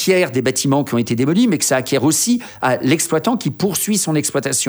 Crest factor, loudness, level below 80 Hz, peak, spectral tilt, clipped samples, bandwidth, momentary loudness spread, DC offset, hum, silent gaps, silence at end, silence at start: 14 dB; -16 LUFS; -58 dBFS; -2 dBFS; -4 dB/octave; under 0.1%; over 20 kHz; 4 LU; under 0.1%; none; none; 0 s; 0 s